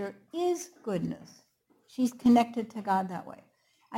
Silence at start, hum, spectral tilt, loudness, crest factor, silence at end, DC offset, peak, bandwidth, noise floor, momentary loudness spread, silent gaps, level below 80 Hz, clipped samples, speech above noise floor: 0 s; none; -6 dB/octave; -29 LUFS; 18 dB; 0 s; under 0.1%; -12 dBFS; 16 kHz; -47 dBFS; 18 LU; none; -68 dBFS; under 0.1%; 18 dB